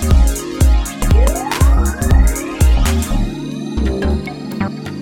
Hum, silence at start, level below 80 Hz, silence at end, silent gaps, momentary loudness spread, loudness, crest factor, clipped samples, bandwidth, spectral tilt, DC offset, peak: none; 0 s; -14 dBFS; 0 s; none; 9 LU; -16 LUFS; 12 dB; under 0.1%; 16.5 kHz; -5.5 dB/octave; under 0.1%; 0 dBFS